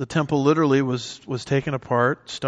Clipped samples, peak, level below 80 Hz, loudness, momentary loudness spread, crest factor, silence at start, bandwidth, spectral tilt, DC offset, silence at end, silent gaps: under 0.1%; -6 dBFS; -56 dBFS; -22 LUFS; 10 LU; 16 dB; 0 s; 9.6 kHz; -6.5 dB/octave; under 0.1%; 0 s; none